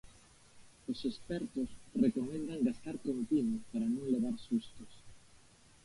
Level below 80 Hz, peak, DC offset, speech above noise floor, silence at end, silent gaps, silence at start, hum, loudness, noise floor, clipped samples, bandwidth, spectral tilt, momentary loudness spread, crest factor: -64 dBFS; -18 dBFS; under 0.1%; 26 dB; 0.5 s; none; 0.05 s; none; -36 LUFS; -62 dBFS; under 0.1%; 11.5 kHz; -6.5 dB/octave; 10 LU; 18 dB